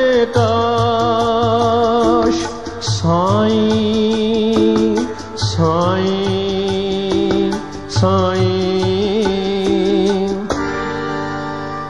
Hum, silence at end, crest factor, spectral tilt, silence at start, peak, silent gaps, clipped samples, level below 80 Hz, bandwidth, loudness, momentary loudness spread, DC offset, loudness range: none; 0 s; 14 dB; -6 dB/octave; 0 s; -2 dBFS; none; under 0.1%; -40 dBFS; 11 kHz; -16 LUFS; 7 LU; 1%; 2 LU